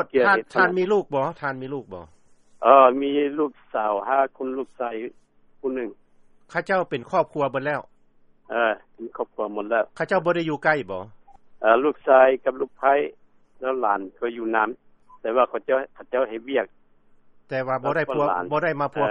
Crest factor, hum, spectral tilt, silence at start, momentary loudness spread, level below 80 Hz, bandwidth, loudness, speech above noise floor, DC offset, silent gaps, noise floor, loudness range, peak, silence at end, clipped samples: 22 dB; none; -7 dB/octave; 0 s; 14 LU; -64 dBFS; 9.2 kHz; -23 LUFS; 34 dB; under 0.1%; none; -56 dBFS; 6 LU; -2 dBFS; 0 s; under 0.1%